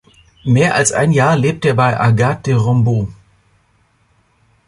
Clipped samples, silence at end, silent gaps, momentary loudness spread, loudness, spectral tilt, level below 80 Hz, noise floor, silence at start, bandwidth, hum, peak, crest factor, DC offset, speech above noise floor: under 0.1%; 1.55 s; none; 5 LU; -14 LUFS; -5.5 dB/octave; -44 dBFS; -57 dBFS; 0.45 s; 11.5 kHz; none; -2 dBFS; 14 dB; under 0.1%; 44 dB